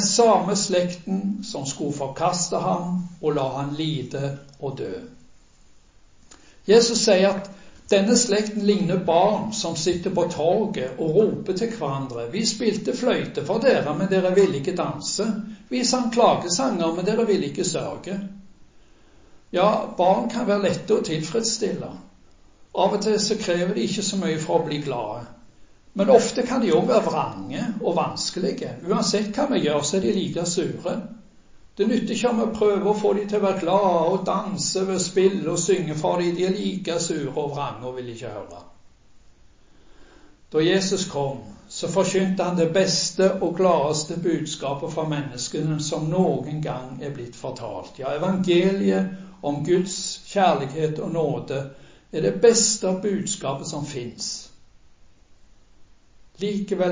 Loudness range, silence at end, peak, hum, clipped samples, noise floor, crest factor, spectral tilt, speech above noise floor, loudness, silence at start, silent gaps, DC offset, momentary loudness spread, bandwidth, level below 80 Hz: 6 LU; 0 s; -2 dBFS; none; under 0.1%; -52 dBFS; 22 dB; -4.5 dB/octave; 29 dB; -23 LUFS; 0 s; none; under 0.1%; 12 LU; 7.8 kHz; -56 dBFS